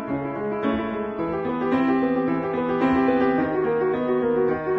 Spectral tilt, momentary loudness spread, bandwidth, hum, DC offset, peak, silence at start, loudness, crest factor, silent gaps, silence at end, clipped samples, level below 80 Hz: -9 dB/octave; 7 LU; 5.6 kHz; none; under 0.1%; -10 dBFS; 0 s; -23 LUFS; 12 dB; none; 0 s; under 0.1%; -52 dBFS